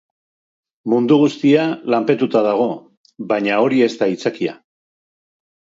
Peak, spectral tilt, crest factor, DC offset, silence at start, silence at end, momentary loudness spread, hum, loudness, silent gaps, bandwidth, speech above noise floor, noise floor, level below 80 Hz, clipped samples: -2 dBFS; -6.5 dB/octave; 16 dB; under 0.1%; 0.85 s; 1.2 s; 11 LU; none; -17 LUFS; 2.97-3.04 s; 7.8 kHz; over 74 dB; under -90 dBFS; -68 dBFS; under 0.1%